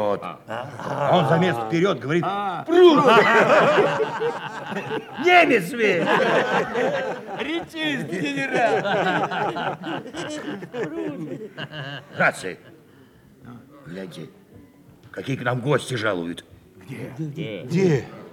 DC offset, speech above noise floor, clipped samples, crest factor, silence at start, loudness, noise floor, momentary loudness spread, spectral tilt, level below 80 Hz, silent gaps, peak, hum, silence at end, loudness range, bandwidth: under 0.1%; 29 dB; under 0.1%; 20 dB; 0 s; -21 LUFS; -51 dBFS; 19 LU; -5.5 dB/octave; -64 dBFS; none; -4 dBFS; none; 0 s; 12 LU; 15 kHz